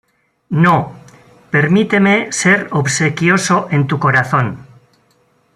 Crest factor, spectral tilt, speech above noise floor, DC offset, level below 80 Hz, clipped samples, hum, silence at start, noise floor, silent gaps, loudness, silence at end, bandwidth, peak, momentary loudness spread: 14 dB; -5 dB/octave; 43 dB; under 0.1%; -54 dBFS; under 0.1%; none; 0.5 s; -57 dBFS; none; -14 LUFS; 0.9 s; 12.5 kHz; 0 dBFS; 6 LU